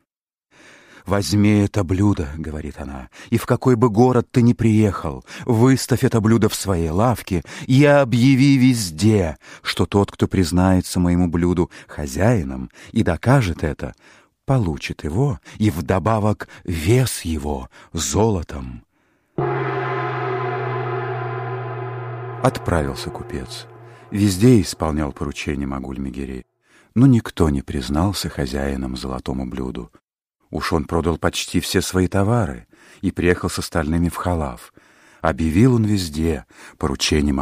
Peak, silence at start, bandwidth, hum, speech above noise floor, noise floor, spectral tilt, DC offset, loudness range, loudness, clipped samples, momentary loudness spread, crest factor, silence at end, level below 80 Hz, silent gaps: 0 dBFS; 1.05 s; 15.5 kHz; none; 60 dB; -78 dBFS; -6 dB/octave; under 0.1%; 7 LU; -20 LUFS; under 0.1%; 14 LU; 18 dB; 0 s; -36 dBFS; 30.04-30.08 s